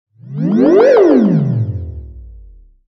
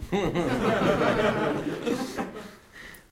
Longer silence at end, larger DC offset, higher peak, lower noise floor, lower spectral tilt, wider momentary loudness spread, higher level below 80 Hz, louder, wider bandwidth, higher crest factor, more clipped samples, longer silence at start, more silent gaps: first, 0.5 s vs 0.1 s; neither; first, 0 dBFS vs -10 dBFS; second, -40 dBFS vs -47 dBFS; first, -9.5 dB/octave vs -6 dB/octave; about the same, 21 LU vs 21 LU; first, -38 dBFS vs -46 dBFS; first, -11 LUFS vs -26 LUFS; second, 6.2 kHz vs 16 kHz; about the same, 12 dB vs 16 dB; neither; first, 0.25 s vs 0 s; neither